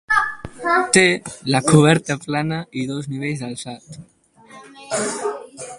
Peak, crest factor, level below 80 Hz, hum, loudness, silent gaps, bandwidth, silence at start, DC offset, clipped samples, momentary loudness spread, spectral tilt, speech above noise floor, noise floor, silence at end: 0 dBFS; 20 dB; -54 dBFS; none; -19 LUFS; none; 11.5 kHz; 0.1 s; under 0.1%; under 0.1%; 17 LU; -4.5 dB/octave; 27 dB; -46 dBFS; 0 s